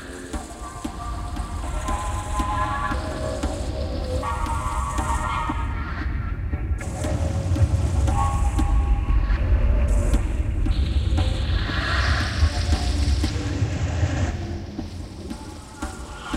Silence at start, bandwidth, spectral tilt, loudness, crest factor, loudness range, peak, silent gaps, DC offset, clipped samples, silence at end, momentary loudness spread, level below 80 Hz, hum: 0 s; 12.5 kHz; -5.5 dB/octave; -25 LUFS; 16 dB; 5 LU; -8 dBFS; none; under 0.1%; under 0.1%; 0 s; 11 LU; -26 dBFS; none